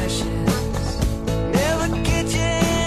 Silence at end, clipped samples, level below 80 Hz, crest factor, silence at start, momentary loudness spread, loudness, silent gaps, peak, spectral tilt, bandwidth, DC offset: 0 s; under 0.1%; -28 dBFS; 14 dB; 0 s; 4 LU; -21 LUFS; none; -6 dBFS; -5 dB/octave; 14 kHz; under 0.1%